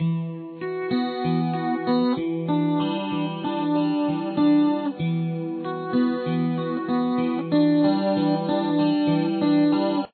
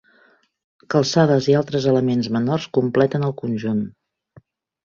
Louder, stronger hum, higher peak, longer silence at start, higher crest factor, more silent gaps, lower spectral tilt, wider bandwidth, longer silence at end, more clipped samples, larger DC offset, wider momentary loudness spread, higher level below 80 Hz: second, -23 LUFS vs -19 LUFS; neither; second, -10 dBFS vs -2 dBFS; second, 0 s vs 0.9 s; about the same, 14 dB vs 18 dB; neither; first, -10.5 dB/octave vs -6.5 dB/octave; second, 4.5 kHz vs 7.4 kHz; second, 0.05 s vs 0.95 s; neither; neither; about the same, 7 LU vs 8 LU; second, -64 dBFS vs -58 dBFS